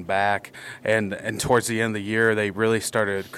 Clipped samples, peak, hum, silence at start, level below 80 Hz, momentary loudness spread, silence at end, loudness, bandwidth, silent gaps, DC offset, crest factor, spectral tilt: under 0.1%; -6 dBFS; none; 0 s; -56 dBFS; 8 LU; 0 s; -23 LUFS; 15.5 kHz; none; under 0.1%; 18 dB; -4.5 dB/octave